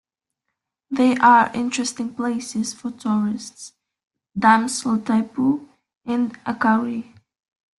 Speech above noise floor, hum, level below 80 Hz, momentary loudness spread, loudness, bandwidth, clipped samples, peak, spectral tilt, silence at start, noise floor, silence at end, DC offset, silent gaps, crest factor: 61 dB; none; -64 dBFS; 16 LU; -20 LUFS; 12 kHz; under 0.1%; -2 dBFS; -4 dB/octave; 0.9 s; -80 dBFS; 0.75 s; under 0.1%; 5.97-6.01 s; 20 dB